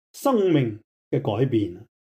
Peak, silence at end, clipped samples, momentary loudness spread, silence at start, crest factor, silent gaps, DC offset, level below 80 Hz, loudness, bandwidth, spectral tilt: -10 dBFS; 0.35 s; under 0.1%; 10 LU; 0.15 s; 14 dB; 0.84-1.11 s; under 0.1%; -66 dBFS; -24 LUFS; 15.5 kHz; -7.5 dB/octave